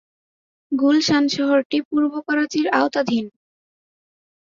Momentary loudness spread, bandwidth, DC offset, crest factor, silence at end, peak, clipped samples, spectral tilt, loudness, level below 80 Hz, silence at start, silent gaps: 7 LU; 7.6 kHz; under 0.1%; 18 dB; 1.1 s; -2 dBFS; under 0.1%; -4 dB/octave; -19 LUFS; -64 dBFS; 0.7 s; 1.65-1.70 s, 1.85-1.91 s